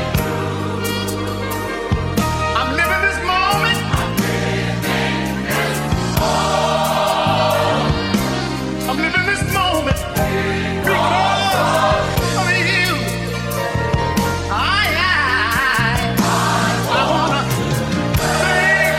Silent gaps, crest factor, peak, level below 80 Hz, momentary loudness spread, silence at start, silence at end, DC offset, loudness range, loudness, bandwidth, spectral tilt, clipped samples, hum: none; 16 dB; -2 dBFS; -32 dBFS; 6 LU; 0 s; 0 s; 0.1%; 2 LU; -17 LUFS; 16.5 kHz; -4.5 dB/octave; under 0.1%; none